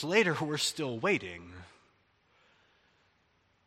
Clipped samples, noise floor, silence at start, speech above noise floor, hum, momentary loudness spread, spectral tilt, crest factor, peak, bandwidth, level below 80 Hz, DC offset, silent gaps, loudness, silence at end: under 0.1%; -71 dBFS; 0 s; 40 dB; none; 22 LU; -3.5 dB/octave; 24 dB; -12 dBFS; 13 kHz; -72 dBFS; under 0.1%; none; -31 LUFS; 2 s